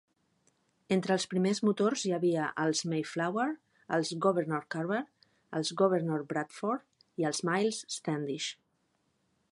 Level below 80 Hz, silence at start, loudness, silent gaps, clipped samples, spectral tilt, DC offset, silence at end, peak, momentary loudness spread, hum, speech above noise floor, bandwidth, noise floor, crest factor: -80 dBFS; 0.9 s; -32 LUFS; none; under 0.1%; -5 dB/octave; under 0.1%; 1 s; -14 dBFS; 8 LU; none; 45 dB; 11.5 kHz; -76 dBFS; 18 dB